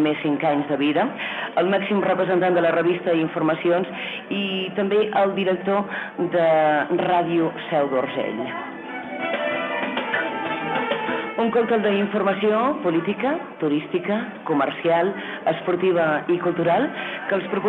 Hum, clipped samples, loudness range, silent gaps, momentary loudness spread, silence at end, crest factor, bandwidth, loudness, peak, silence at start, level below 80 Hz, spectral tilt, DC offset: none; under 0.1%; 3 LU; none; 7 LU; 0 s; 12 dB; 4.2 kHz; -22 LUFS; -10 dBFS; 0 s; -66 dBFS; -8 dB/octave; under 0.1%